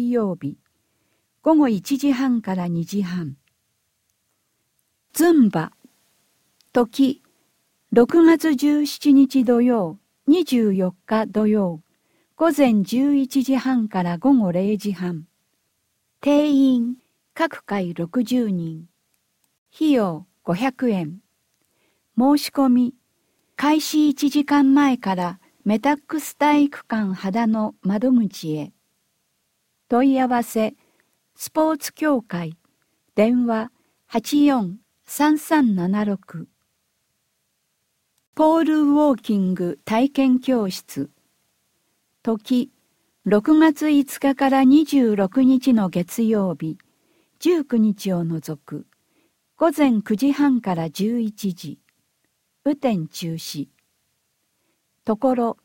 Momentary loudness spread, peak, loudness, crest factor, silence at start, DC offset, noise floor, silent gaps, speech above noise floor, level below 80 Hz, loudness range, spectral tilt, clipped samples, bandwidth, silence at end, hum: 14 LU; -2 dBFS; -20 LUFS; 18 dB; 0 s; under 0.1%; -72 dBFS; 19.58-19.66 s, 38.27-38.33 s; 53 dB; -64 dBFS; 6 LU; -6 dB/octave; under 0.1%; 17 kHz; 0.1 s; none